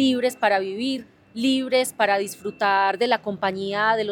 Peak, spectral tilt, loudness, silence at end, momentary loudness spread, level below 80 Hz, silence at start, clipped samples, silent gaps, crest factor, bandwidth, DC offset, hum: -4 dBFS; -3.5 dB/octave; -23 LUFS; 0 s; 7 LU; -66 dBFS; 0 s; under 0.1%; none; 18 dB; 18 kHz; under 0.1%; none